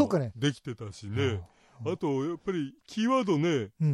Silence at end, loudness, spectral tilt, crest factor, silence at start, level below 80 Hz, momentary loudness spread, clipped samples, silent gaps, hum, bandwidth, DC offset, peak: 0 s; -30 LUFS; -6.5 dB/octave; 18 dB; 0 s; -66 dBFS; 12 LU; under 0.1%; none; none; 11.5 kHz; under 0.1%; -12 dBFS